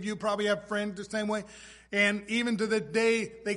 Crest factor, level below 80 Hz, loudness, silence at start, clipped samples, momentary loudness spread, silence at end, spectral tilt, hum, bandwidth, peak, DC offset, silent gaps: 18 dB; -64 dBFS; -29 LUFS; 0 s; under 0.1%; 8 LU; 0 s; -4 dB/octave; none; 11.5 kHz; -12 dBFS; under 0.1%; none